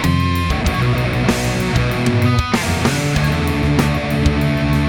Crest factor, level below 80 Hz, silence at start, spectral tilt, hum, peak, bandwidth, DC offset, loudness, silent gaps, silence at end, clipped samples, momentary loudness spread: 16 dB; -26 dBFS; 0 s; -5.5 dB/octave; none; 0 dBFS; 18.5 kHz; under 0.1%; -17 LUFS; none; 0 s; under 0.1%; 2 LU